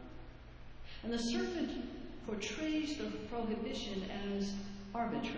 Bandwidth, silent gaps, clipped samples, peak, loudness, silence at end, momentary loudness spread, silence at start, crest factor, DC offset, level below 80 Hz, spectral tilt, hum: 8 kHz; none; under 0.1%; -26 dBFS; -40 LUFS; 0 s; 17 LU; 0 s; 14 dB; under 0.1%; -54 dBFS; -4.5 dB/octave; none